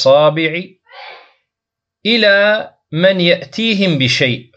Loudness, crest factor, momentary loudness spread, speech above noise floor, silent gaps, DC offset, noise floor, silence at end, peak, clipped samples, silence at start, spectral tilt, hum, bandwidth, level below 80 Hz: -13 LUFS; 14 dB; 14 LU; 69 dB; none; under 0.1%; -82 dBFS; 0.15 s; 0 dBFS; under 0.1%; 0 s; -5 dB/octave; none; 8.4 kHz; -62 dBFS